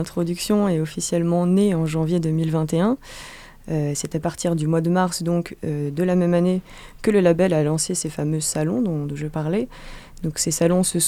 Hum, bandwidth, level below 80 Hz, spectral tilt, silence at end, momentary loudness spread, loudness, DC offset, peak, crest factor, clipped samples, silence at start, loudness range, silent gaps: none; 15 kHz; -46 dBFS; -5.5 dB/octave; 0 s; 10 LU; -22 LUFS; under 0.1%; -4 dBFS; 16 dB; under 0.1%; 0 s; 3 LU; none